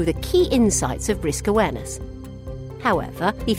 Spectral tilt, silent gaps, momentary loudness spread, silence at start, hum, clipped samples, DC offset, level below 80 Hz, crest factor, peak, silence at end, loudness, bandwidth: -4.5 dB/octave; none; 17 LU; 0 s; none; under 0.1%; under 0.1%; -34 dBFS; 16 dB; -6 dBFS; 0 s; -21 LUFS; 16.5 kHz